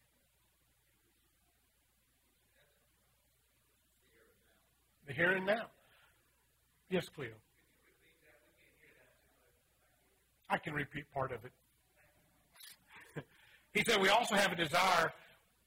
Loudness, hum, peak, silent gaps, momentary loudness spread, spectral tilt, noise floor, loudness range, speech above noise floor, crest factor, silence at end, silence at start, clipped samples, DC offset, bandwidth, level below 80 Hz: -34 LUFS; none; -16 dBFS; none; 22 LU; -3.5 dB/octave; -76 dBFS; 14 LU; 41 dB; 24 dB; 0.5 s; 5.05 s; under 0.1%; under 0.1%; 16 kHz; -72 dBFS